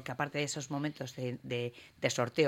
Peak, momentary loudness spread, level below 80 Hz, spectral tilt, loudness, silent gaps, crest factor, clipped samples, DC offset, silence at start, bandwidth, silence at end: -14 dBFS; 7 LU; -72 dBFS; -4.5 dB/octave; -36 LUFS; none; 22 dB; under 0.1%; under 0.1%; 0 s; 16.5 kHz; 0 s